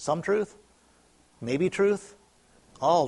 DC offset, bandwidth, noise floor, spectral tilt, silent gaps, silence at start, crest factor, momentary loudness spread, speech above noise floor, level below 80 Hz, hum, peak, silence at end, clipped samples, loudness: under 0.1%; 11.5 kHz; -61 dBFS; -5.5 dB/octave; none; 0 s; 18 dB; 10 LU; 36 dB; -66 dBFS; none; -12 dBFS; 0 s; under 0.1%; -27 LUFS